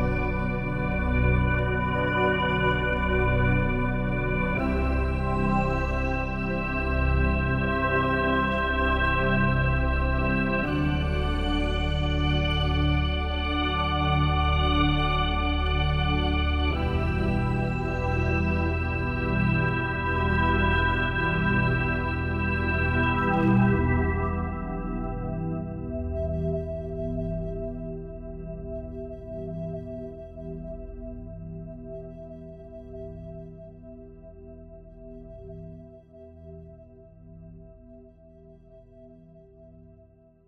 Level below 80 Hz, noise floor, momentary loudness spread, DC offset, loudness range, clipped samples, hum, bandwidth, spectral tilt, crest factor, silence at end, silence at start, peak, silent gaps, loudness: -32 dBFS; -55 dBFS; 18 LU; under 0.1%; 18 LU; under 0.1%; 60 Hz at -55 dBFS; 6.8 kHz; -8 dB/octave; 16 dB; 0.65 s; 0 s; -10 dBFS; none; -26 LUFS